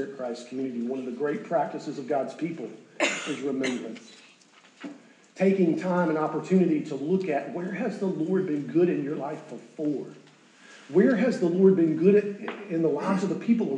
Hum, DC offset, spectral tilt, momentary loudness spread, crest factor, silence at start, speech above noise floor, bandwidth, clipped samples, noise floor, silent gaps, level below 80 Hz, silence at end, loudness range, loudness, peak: none; under 0.1%; -6.5 dB/octave; 14 LU; 18 dB; 0 s; 30 dB; 9.6 kHz; under 0.1%; -56 dBFS; none; under -90 dBFS; 0 s; 6 LU; -26 LUFS; -8 dBFS